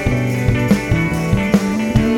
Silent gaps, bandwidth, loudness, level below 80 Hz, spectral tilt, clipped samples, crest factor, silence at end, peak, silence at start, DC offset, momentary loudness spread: none; 17 kHz; -16 LUFS; -28 dBFS; -7 dB/octave; under 0.1%; 14 dB; 0 s; 0 dBFS; 0 s; under 0.1%; 2 LU